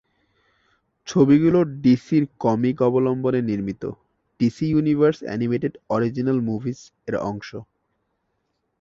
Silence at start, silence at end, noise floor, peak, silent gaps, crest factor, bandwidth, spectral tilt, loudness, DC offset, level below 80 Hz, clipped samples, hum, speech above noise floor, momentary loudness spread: 1.05 s; 1.2 s; -73 dBFS; -4 dBFS; none; 18 dB; 7.4 kHz; -8 dB/octave; -21 LUFS; under 0.1%; -56 dBFS; under 0.1%; none; 53 dB; 15 LU